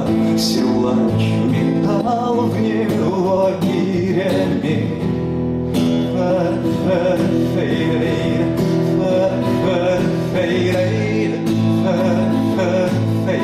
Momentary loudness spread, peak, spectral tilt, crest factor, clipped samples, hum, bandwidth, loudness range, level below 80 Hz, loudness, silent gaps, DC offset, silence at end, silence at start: 2 LU; -8 dBFS; -7 dB/octave; 8 dB; under 0.1%; none; 15 kHz; 1 LU; -44 dBFS; -17 LUFS; none; under 0.1%; 0 s; 0 s